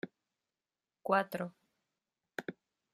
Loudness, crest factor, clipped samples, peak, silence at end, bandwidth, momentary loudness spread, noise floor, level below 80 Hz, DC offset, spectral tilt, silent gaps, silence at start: -37 LUFS; 26 dB; under 0.1%; -14 dBFS; 0.4 s; 15 kHz; 16 LU; under -90 dBFS; -86 dBFS; under 0.1%; -6 dB/octave; none; 0.05 s